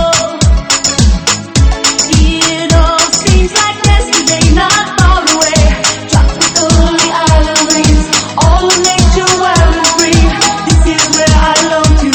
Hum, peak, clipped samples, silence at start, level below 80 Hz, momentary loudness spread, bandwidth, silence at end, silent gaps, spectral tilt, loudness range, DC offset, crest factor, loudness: none; 0 dBFS; 0.6%; 0 s; -12 dBFS; 3 LU; 18.5 kHz; 0 s; none; -3.5 dB/octave; 1 LU; under 0.1%; 8 dB; -8 LUFS